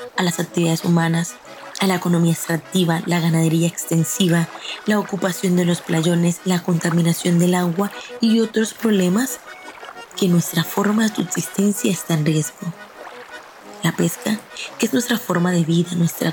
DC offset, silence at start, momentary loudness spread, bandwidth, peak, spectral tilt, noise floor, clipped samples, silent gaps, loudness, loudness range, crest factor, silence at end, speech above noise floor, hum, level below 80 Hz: under 0.1%; 0 s; 14 LU; 17.5 kHz; -4 dBFS; -5 dB/octave; -38 dBFS; under 0.1%; none; -19 LUFS; 4 LU; 16 dB; 0 s; 20 dB; none; -66 dBFS